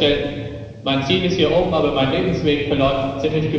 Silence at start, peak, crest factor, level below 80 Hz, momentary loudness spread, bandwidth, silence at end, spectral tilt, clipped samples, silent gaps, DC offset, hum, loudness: 0 s; -4 dBFS; 16 dB; -38 dBFS; 9 LU; 7.8 kHz; 0 s; -6.5 dB/octave; under 0.1%; none; under 0.1%; none; -19 LUFS